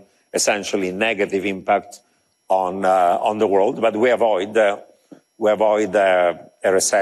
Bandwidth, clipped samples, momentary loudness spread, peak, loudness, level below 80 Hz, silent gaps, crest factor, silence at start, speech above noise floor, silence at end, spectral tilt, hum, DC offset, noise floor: 13 kHz; under 0.1%; 6 LU; -6 dBFS; -19 LUFS; -66 dBFS; none; 12 dB; 0.35 s; 30 dB; 0 s; -3 dB/octave; none; under 0.1%; -48 dBFS